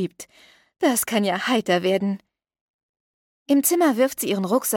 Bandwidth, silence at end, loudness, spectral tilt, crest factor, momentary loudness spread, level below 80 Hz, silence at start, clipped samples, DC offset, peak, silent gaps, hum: 17.5 kHz; 0 s; -21 LUFS; -4 dB/octave; 16 dB; 9 LU; -70 dBFS; 0 s; under 0.1%; under 0.1%; -8 dBFS; 2.61-2.94 s, 3.00-3.46 s; none